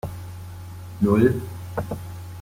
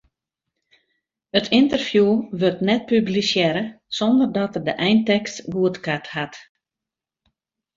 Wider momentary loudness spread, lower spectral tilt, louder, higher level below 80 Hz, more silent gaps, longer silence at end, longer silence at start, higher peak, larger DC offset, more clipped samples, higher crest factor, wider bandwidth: first, 20 LU vs 9 LU; first, -8 dB/octave vs -5.5 dB/octave; second, -24 LUFS vs -20 LUFS; first, -48 dBFS vs -60 dBFS; neither; second, 0 s vs 1.35 s; second, 0.05 s vs 1.35 s; second, -6 dBFS vs -2 dBFS; neither; neither; about the same, 20 dB vs 20 dB; first, 16.5 kHz vs 7.6 kHz